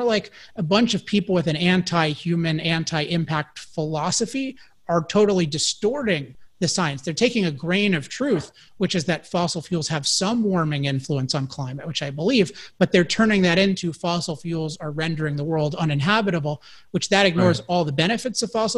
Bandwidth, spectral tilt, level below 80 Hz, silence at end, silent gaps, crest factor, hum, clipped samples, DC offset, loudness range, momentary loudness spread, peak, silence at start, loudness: 12 kHz; -4.5 dB/octave; -54 dBFS; 0 s; none; 20 dB; none; under 0.1%; 0.2%; 2 LU; 9 LU; -2 dBFS; 0 s; -22 LUFS